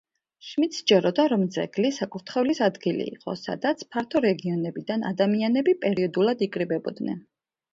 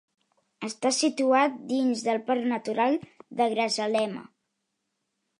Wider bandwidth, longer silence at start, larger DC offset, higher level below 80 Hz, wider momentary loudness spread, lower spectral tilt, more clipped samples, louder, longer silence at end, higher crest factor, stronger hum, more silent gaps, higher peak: second, 7.8 kHz vs 11.5 kHz; second, 0.45 s vs 0.6 s; neither; first, -68 dBFS vs -80 dBFS; about the same, 11 LU vs 11 LU; first, -6 dB/octave vs -3 dB/octave; neither; about the same, -25 LUFS vs -26 LUFS; second, 0.55 s vs 1.15 s; about the same, 18 dB vs 18 dB; neither; neither; about the same, -8 dBFS vs -10 dBFS